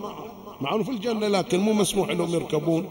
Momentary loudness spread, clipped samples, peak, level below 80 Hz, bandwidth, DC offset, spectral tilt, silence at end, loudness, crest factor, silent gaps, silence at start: 12 LU; under 0.1%; -8 dBFS; -56 dBFS; 16.5 kHz; under 0.1%; -5 dB/octave; 0 s; -25 LUFS; 16 dB; none; 0 s